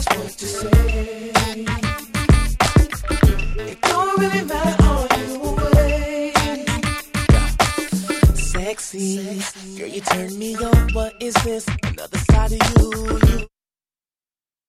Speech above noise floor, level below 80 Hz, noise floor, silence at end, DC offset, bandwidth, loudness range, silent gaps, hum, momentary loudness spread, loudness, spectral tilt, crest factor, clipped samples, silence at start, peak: over 72 dB; -22 dBFS; under -90 dBFS; 1.2 s; under 0.1%; 15.5 kHz; 3 LU; none; none; 9 LU; -19 LUFS; -5 dB/octave; 16 dB; under 0.1%; 0 s; -2 dBFS